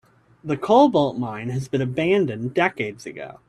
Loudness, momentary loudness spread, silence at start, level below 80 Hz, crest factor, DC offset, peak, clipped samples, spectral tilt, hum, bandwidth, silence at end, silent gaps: -21 LUFS; 14 LU; 0.45 s; -58 dBFS; 18 dB; under 0.1%; -4 dBFS; under 0.1%; -7 dB/octave; none; 12 kHz; 0.15 s; none